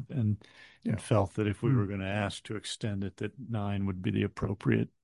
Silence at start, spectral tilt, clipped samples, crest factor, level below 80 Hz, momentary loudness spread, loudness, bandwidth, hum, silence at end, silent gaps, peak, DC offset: 0 s; -7 dB/octave; under 0.1%; 20 dB; -52 dBFS; 9 LU; -32 LUFS; 11.5 kHz; none; 0.15 s; none; -12 dBFS; under 0.1%